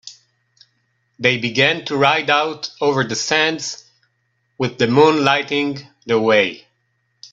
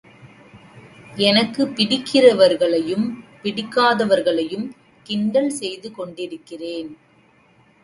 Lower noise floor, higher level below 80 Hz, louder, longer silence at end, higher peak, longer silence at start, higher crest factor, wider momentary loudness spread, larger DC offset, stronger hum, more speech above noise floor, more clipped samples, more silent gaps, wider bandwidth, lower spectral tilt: first, -68 dBFS vs -55 dBFS; about the same, -60 dBFS vs -64 dBFS; about the same, -17 LUFS vs -19 LUFS; second, 0.05 s vs 0.9 s; about the same, 0 dBFS vs 0 dBFS; second, 0.05 s vs 0.25 s; about the same, 18 dB vs 20 dB; second, 11 LU vs 18 LU; neither; neither; first, 51 dB vs 36 dB; neither; neither; second, 7.8 kHz vs 11.5 kHz; about the same, -4 dB/octave vs -4.5 dB/octave